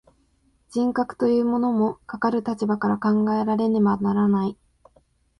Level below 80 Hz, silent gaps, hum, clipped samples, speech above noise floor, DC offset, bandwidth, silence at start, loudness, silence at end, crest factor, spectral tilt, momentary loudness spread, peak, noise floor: -58 dBFS; none; none; under 0.1%; 42 dB; under 0.1%; 9.8 kHz; 0.7 s; -23 LUFS; 0.85 s; 14 dB; -8.5 dB/octave; 5 LU; -8 dBFS; -64 dBFS